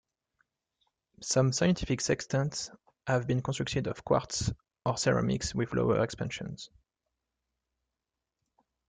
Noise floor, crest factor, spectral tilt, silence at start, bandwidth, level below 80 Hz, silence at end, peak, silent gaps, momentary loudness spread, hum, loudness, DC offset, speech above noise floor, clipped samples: -88 dBFS; 20 dB; -5 dB/octave; 1.2 s; 9.6 kHz; -54 dBFS; 2.25 s; -12 dBFS; none; 12 LU; none; -30 LUFS; under 0.1%; 58 dB; under 0.1%